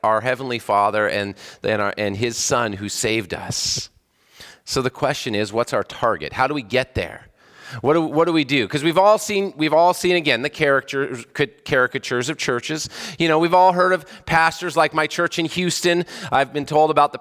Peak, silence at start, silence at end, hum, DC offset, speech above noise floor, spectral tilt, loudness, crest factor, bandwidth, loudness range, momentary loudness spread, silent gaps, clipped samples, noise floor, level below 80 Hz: -2 dBFS; 0.05 s; 0 s; none; under 0.1%; 28 dB; -4 dB/octave; -20 LUFS; 18 dB; 16 kHz; 5 LU; 9 LU; none; under 0.1%; -48 dBFS; -50 dBFS